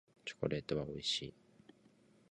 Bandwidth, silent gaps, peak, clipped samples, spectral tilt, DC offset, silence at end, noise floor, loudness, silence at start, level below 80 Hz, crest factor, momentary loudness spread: 11 kHz; none; -20 dBFS; under 0.1%; -4.5 dB/octave; under 0.1%; 1 s; -68 dBFS; -40 LUFS; 0.25 s; -66 dBFS; 22 dB; 10 LU